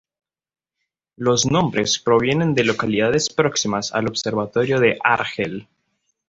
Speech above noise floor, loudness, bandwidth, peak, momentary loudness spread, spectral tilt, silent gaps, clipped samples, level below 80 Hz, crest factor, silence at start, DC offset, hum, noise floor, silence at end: over 71 dB; -19 LUFS; 8 kHz; -2 dBFS; 7 LU; -4 dB/octave; none; under 0.1%; -52 dBFS; 18 dB; 1.2 s; under 0.1%; none; under -90 dBFS; 0.65 s